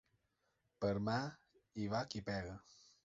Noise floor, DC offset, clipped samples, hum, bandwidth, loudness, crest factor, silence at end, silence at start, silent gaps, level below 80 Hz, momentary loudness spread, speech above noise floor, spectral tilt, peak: -83 dBFS; under 0.1%; under 0.1%; none; 7.6 kHz; -42 LUFS; 18 dB; 0.45 s; 0.8 s; none; -66 dBFS; 13 LU; 42 dB; -5 dB/octave; -24 dBFS